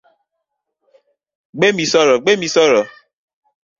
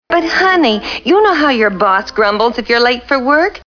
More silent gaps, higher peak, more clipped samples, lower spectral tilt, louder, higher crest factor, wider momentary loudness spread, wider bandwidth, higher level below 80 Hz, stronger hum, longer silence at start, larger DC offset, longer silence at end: neither; about the same, -2 dBFS vs 0 dBFS; neither; about the same, -3.5 dB/octave vs -4.5 dB/octave; about the same, -14 LUFS vs -12 LUFS; about the same, 16 dB vs 12 dB; first, 9 LU vs 4 LU; first, 7.6 kHz vs 5.4 kHz; second, -62 dBFS vs -44 dBFS; neither; first, 1.55 s vs 0.1 s; neither; first, 0.9 s vs 0.1 s